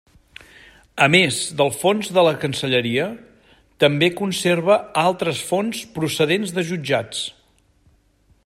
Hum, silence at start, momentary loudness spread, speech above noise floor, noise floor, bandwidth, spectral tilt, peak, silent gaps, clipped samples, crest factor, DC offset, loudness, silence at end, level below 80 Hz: none; 0.95 s; 10 LU; 39 dB; -59 dBFS; 16 kHz; -4 dB/octave; -2 dBFS; none; under 0.1%; 20 dB; under 0.1%; -19 LUFS; 1.15 s; -60 dBFS